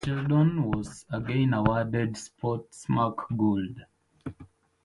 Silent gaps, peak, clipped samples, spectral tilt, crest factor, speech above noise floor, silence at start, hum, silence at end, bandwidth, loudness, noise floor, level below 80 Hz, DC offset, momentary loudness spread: none; -8 dBFS; under 0.1%; -7.5 dB/octave; 20 dB; 26 dB; 0 s; none; 0.4 s; 11.5 kHz; -28 LUFS; -53 dBFS; -50 dBFS; under 0.1%; 19 LU